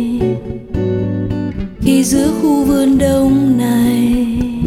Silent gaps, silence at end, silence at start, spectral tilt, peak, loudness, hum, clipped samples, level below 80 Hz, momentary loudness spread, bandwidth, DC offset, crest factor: none; 0 s; 0 s; -6 dB/octave; -2 dBFS; -14 LUFS; none; under 0.1%; -30 dBFS; 8 LU; 16.5 kHz; under 0.1%; 12 dB